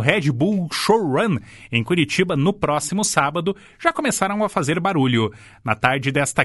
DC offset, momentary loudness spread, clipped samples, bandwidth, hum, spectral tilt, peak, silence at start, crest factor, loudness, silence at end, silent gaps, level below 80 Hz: under 0.1%; 6 LU; under 0.1%; 12 kHz; none; -4.5 dB/octave; 0 dBFS; 0 s; 20 dB; -20 LUFS; 0 s; none; -52 dBFS